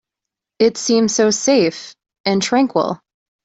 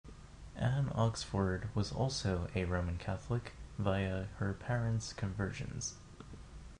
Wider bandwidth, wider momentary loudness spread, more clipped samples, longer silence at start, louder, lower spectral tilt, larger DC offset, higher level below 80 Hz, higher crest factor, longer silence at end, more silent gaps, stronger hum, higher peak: second, 8.2 kHz vs 10.5 kHz; second, 10 LU vs 18 LU; neither; first, 0.6 s vs 0.05 s; first, -16 LUFS vs -37 LUFS; second, -3.5 dB/octave vs -5.5 dB/octave; neither; second, -60 dBFS vs -50 dBFS; about the same, 16 dB vs 18 dB; first, 0.5 s vs 0 s; first, 2.20-2.24 s vs none; neither; first, -2 dBFS vs -20 dBFS